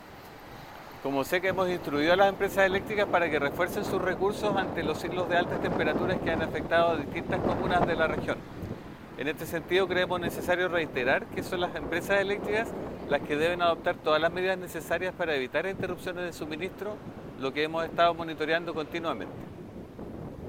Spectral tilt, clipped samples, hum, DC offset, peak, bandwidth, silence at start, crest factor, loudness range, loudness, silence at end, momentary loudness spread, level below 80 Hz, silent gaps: -5.5 dB/octave; under 0.1%; none; under 0.1%; -8 dBFS; 16.5 kHz; 0 s; 20 dB; 4 LU; -29 LUFS; 0 s; 15 LU; -52 dBFS; none